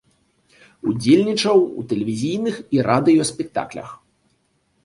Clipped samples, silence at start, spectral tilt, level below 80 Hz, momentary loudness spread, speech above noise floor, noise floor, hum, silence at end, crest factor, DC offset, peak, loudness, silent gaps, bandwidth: under 0.1%; 0.85 s; -5.5 dB/octave; -58 dBFS; 12 LU; 47 dB; -65 dBFS; none; 0.9 s; 18 dB; under 0.1%; -2 dBFS; -19 LUFS; none; 11.5 kHz